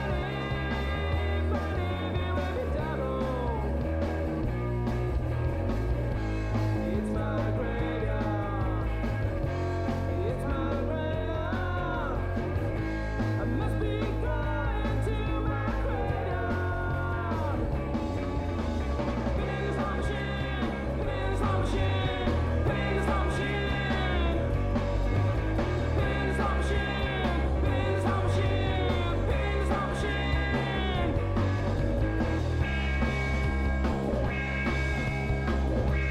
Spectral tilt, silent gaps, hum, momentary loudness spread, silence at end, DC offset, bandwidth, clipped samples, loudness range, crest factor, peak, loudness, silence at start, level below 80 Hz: -7.5 dB/octave; none; none; 3 LU; 0 s; under 0.1%; 11 kHz; under 0.1%; 3 LU; 12 dB; -16 dBFS; -30 LUFS; 0 s; -34 dBFS